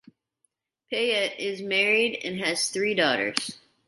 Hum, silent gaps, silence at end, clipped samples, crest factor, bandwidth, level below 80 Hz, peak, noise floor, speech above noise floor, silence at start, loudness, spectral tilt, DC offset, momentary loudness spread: none; none; 0.3 s; under 0.1%; 24 dB; 11.5 kHz; -74 dBFS; -4 dBFS; -75 dBFS; 49 dB; 0.9 s; -25 LUFS; -2 dB/octave; under 0.1%; 9 LU